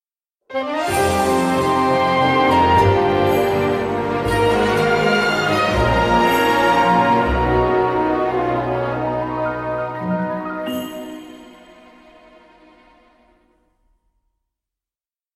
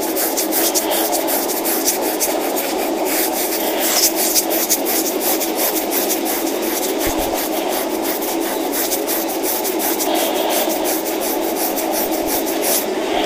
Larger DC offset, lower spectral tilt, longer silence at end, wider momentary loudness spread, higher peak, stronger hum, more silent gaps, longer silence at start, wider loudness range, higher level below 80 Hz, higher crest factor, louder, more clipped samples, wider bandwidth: neither; first, -5.5 dB/octave vs -1.5 dB/octave; first, 3.85 s vs 0 s; first, 10 LU vs 4 LU; about the same, -4 dBFS vs -2 dBFS; neither; neither; first, 0.5 s vs 0 s; first, 12 LU vs 3 LU; first, -36 dBFS vs -46 dBFS; about the same, 16 dB vs 16 dB; about the same, -17 LUFS vs -17 LUFS; neither; about the same, 15.5 kHz vs 16.5 kHz